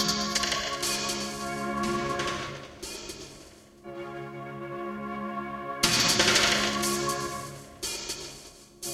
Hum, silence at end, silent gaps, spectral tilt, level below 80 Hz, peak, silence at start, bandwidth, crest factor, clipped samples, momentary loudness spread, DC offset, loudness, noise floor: none; 0 s; none; -2 dB/octave; -54 dBFS; -8 dBFS; 0 s; 16.5 kHz; 22 dB; under 0.1%; 20 LU; under 0.1%; -27 LUFS; -51 dBFS